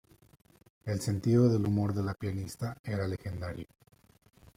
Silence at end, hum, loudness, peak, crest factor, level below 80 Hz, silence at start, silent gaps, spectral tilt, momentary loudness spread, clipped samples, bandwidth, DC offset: 0.95 s; none; -32 LUFS; -14 dBFS; 18 dB; -60 dBFS; 0.85 s; 2.79-2.84 s; -7.5 dB/octave; 15 LU; under 0.1%; 15.5 kHz; under 0.1%